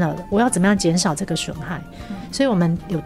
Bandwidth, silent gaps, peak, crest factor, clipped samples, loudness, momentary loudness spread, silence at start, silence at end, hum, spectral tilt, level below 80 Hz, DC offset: 13.5 kHz; none; -6 dBFS; 14 dB; under 0.1%; -20 LUFS; 14 LU; 0 s; 0 s; none; -5 dB/octave; -42 dBFS; under 0.1%